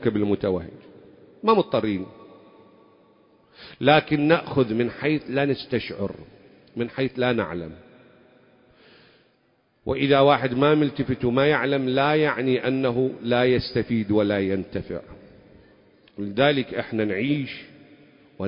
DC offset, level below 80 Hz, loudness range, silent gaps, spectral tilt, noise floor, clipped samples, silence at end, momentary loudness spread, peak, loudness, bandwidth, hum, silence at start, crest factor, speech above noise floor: under 0.1%; -52 dBFS; 8 LU; none; -11 dB/octave; -65 dBFS; under 0.1%; 0 s; 13 LU; -4 dBFS; -23 LUFS; 5.4 kHz; none; 0 s; 20 dB; 43 dB